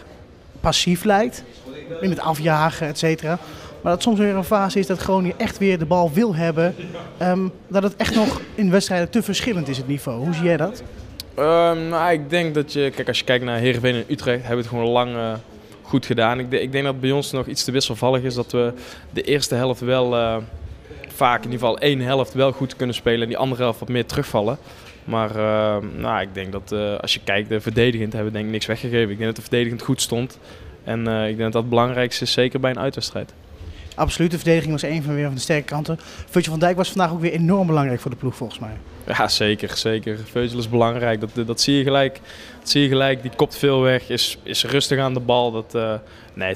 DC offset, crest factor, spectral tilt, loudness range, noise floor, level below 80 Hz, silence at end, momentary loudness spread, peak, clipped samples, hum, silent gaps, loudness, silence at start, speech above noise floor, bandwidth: under 0.1%; 20 dB; -5 dB/octave; 3 LU; -43 dBFS; -44 dBFS; 0 s; 10 LU; 0 dBFS; under 0.1%; none; none; -21 LUFS; 0 s; 23 dB; 15.5 kHz